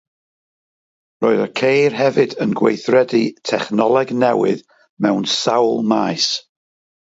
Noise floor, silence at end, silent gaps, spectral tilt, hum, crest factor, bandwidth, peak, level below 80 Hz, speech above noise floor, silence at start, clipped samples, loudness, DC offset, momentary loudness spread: under -90 dBFS; 0.6 s; 4.89-4.97 s; -4.5 dB/octave; none; 16 dB; 8 kHz; 0 dBFS; -66 dBFS; over 74 dB; 1.2 s; under 0.1%; -17 LUFS; under 0.1%; 6 LU